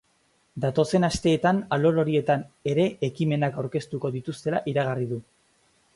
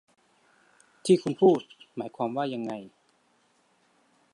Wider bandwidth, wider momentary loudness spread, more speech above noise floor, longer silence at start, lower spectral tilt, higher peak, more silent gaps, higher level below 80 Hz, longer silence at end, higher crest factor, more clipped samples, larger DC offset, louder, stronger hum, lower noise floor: about the same, 11.5 kHz vs 11.5 kHz; second, 8 LU vs 16 LU; about the same, 42 dB vs 42 dB; second, 0.55 s vs 1.05 s; about the same, -6.5 dB/octave vs -6.5 dB/octave; about the same, -10 dBFS vs -8 dBFS; neither; first, -54 dBFS vs -78 dBFS; second, 0.75 s vs 1.45 s; about the same, 16 dB vs 20 dB; neither; neither; about the same, -25 LUFS vs -27 LUFS; neither; about the same, -66 dBFS vs -67 dBFS